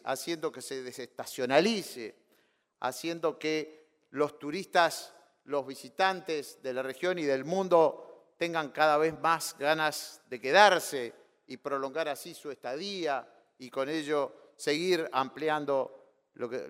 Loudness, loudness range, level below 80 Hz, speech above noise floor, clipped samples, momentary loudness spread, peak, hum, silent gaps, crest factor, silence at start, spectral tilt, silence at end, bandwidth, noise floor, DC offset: -30 LUFS; 7 LU; -80 dBFS; 40 dB; under 0.1%; 16 LU; -6 dBFS; none; none; 24 dB; 0.05 s; -3.5 dB/octave; 0 s; 16 kHz; -71 dBFS; under 0.1%